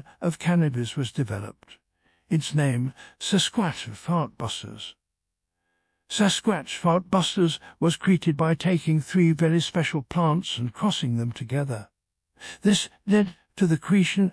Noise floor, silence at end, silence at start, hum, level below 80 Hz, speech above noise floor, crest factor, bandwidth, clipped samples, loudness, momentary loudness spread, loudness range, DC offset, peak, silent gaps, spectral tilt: -84 dBFS; 0 s; 0.2 s; none; -62 dBFS; 60 dB; 16 dB; 11 kHz; under 0.1%; -25 LUFS; 10 LU; 5 LU; under 0.1%; -8 dBFS; none; -5.5 dB/octave